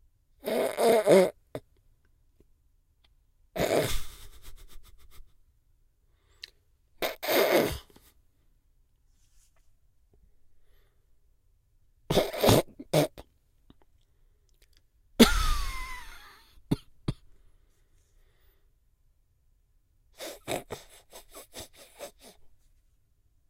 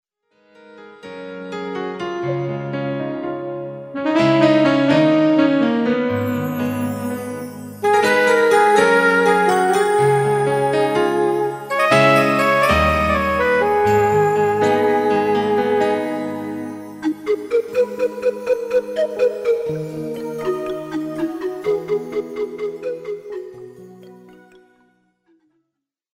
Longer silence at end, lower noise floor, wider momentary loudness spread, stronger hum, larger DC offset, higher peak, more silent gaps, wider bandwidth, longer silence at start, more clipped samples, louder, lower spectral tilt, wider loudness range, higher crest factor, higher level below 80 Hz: second, 1.05 s vs 2 s; second, -67 dBFS vs -79 dBFS; first, 26 LU vs 14 LU; neither; neither; second, -4 dBFS vs 0 dBFS; neither; about the same, 16 kHz vs 16 kHz; second, 0.45 s vs 0.75 s; neither; second, -27 LUFS vs -18 LUFS; second, -4.5 dB/octave vs -6 dB/octave; first, 15 LU vs 11 LU; first, 28 dB vs 18 dB; about the same, -42 dBFS vs -44 dBFS